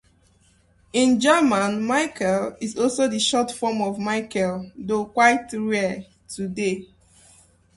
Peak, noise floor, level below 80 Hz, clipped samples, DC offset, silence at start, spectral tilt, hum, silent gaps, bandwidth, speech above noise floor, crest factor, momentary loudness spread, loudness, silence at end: -4 dBFS; -59 dBFS; -58 dBFS; under 0.1%; under 0.1%; 0.95 s; -4 dB/octave; none; none; 11.5 kHz; 37 dB; 20 dB; 11 LU; -22 LUFS; 0.9 s